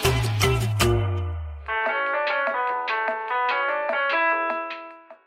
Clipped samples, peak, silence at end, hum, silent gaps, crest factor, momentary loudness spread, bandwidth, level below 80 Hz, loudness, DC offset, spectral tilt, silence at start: under 0.1%; -4 dBFS; 0.1 s; none; none; 20 dB; 9 LU; 16 kHz; -38 dBFS; -24 LUFS; under 0.1%; -4.5 dB/octave; 0 s